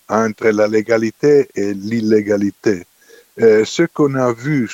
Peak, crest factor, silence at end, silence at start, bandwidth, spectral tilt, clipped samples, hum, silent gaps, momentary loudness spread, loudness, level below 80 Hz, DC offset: 0 dBFS; 14 dB; 0 s; 0.1 s; 8.2 kHz; -6 dB/octave; under 0.1%; none; none; 7 LU; -16 LUFS; -60 dBFS; under 0.1%